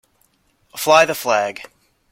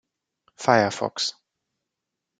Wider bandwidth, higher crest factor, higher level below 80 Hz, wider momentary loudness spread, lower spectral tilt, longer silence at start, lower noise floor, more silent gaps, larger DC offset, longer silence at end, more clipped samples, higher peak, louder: first, 16.5 kHz vs 9.6 kHz; second, 18 dB vs 26 dB; first, -62 dBFS vs -70 dBFS; first, 21 LU vs 8 LU; second, -2 dB/octave vs -3.5 dB/octave; first, 0.75 s vs 0.6 s; second, -62 dBFS vs -84 dBFS; neither; neither; second, 0.45 s vs 1.1 s; neither; about the same, -2 dBFS vs -2 dBFS; first, -16 LUFS vs -23 LUFS